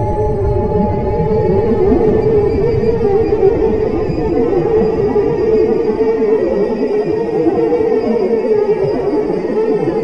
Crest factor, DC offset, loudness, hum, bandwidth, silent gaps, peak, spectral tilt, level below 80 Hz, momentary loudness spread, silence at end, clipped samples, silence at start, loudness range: 12 dB; 2%; -14 LUFS; none; 6.4 kHz; none; 0 dBFS; -9.5 dB/octave; -28 dBFS; 4 LU; 0 s; under 0.1%; 0 s; 1 LU